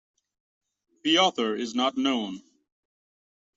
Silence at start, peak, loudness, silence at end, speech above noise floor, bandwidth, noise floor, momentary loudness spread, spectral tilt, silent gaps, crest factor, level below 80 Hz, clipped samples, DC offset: 1.05 s; -8 dBFS; -25 LUFS; 1.15 s; over 65 dB; 8 kHz; under -90 dBFS; 12 LU; -3 dB/octave; none; 20 dB; -76 dBFS; under 0.1%; under 0.1%